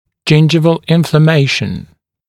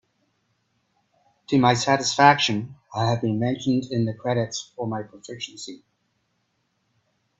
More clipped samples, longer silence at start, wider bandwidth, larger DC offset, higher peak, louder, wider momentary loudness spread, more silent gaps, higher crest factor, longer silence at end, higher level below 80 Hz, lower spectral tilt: neither; second, 0.25 s vs 1.5 s; first, 12.5 kHz vs 8.2 kHz; neither; about the same, 0 dBFS vs -2 dBFS; first, -11 LUFS vs -22 LUFS; second, 9 LU vs 18 LU; neither; second, 12 dB vs 24 dB; second, 0.45 s vs 1.65 s; first, -46 dBFS vs -64 dBFS; first, -6.5 dB/octave vs -4.5 dB/octave